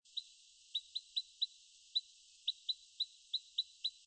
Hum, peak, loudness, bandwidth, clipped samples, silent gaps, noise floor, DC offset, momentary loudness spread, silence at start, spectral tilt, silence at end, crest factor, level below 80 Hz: none; -24 dBFS; -41 LUFS; 8.8 kHz; under 0.1%; none; -64 dBFS; under 0.1%; 13 LU; 0.15 s; 7 dB/octave; 0.15 s; 20 dB; under -90 dBFS